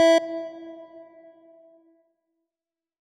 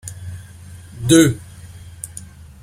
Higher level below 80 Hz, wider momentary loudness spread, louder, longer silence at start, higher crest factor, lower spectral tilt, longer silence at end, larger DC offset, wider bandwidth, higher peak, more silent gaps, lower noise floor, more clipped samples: second, -84 dBFS vs -46 dBFS; about the same, 27 LU vs 26 LU; second, -24 LUFS vs -15 LUFS; about the same, 0 s vs 0.05 s; about the same, 16 dB vs 20 dB; second, -1.5 dB/octave vs -5 dB/octave; first, 2 s vs 0.4 s; neither; second, 13 kHz vs 16 kHz; second, -10 dBFS vs 0 dBFS; neither; first, under -90 dBFS vs -38 dBFS; neither